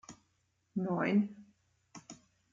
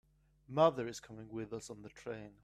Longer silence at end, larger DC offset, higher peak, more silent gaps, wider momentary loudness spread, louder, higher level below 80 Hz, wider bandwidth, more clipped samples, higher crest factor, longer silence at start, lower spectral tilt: first, 0.35 s vs 0.1 s; neither; second, -20 dBFS vs -16 dBFS; neither; first, 25 LU vs 17 LU; first, -34 LUFS vs -37 LUFS; second, -78 dBFS vs -70 dBFS; second, 7.4 kHz vs 13.5 kHz; neither; second, 18 dB vs 24 dB; second, 0.1 s vs 0.5 s; first, -7 dB/octave vs -5.5 dB/octave